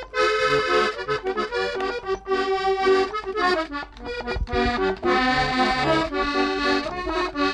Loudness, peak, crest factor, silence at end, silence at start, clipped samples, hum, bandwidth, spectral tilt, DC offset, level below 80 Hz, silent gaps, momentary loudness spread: -23 LUFS; -10 dBFS; 14 dB; 0 s; 0 s; under 0.1%; none; 11 kHz; -4.5 dB/octave; under 0.1%; -40 dBFS; none; 7 LU